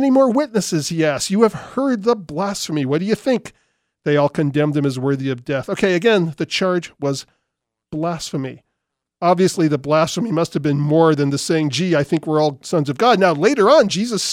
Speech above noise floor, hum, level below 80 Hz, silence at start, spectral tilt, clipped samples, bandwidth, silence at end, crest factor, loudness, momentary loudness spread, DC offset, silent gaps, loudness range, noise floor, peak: 61 dB; none; -58 dBFS; 0 s; -5.5 dB/octave; under 0.1%; 16 kHz; 0 s; 18 dB; -18 LUFS; 9 LU; under 0.1%; none; 5 LU; -79 dBFS; 0 dBFS